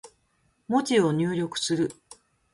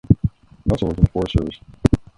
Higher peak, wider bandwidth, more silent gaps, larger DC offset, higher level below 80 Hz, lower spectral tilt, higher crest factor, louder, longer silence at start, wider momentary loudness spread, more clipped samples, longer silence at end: second, -10 dBFS vs 0 dBFS; about the same, 11.5 kHz vs 11 kHz; neither; neither; second, -66 dBFS vs -28 dBFS; second, -5 dB/octave vs -8.5 dB/octave; about the same, 18 dB vs 20 dB; second, -26 LUFS vs -21 LUFS; about the same, 0.05 s vs 0.1 s; second, 6 LU vs 9 LU; neither; first, 0.6 s vs 0.15 s